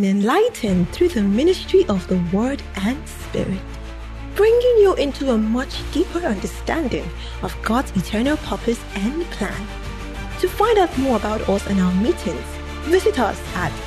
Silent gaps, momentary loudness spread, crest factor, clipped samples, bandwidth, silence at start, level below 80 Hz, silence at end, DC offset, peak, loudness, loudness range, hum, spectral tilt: none; 13 LU; 16 dB; under 0.1%; 13.5 kHz; 0 s; -32 dBFS; 0 s; under 0.1%; -4 dBFS; -20 LUFS; 4 LU; none; -6 dB/octave